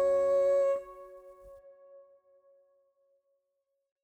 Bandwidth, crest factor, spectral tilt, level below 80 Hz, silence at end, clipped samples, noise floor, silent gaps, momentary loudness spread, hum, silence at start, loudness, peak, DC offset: 8.6 kHz; 12 dB; -5 dB/octave; -70 dBFS; 2.45 s; under 0.1%; -82 dBFS; none; 26 LU; none; 0 s; -28 LUFS; -20 dBFS; under 0.1%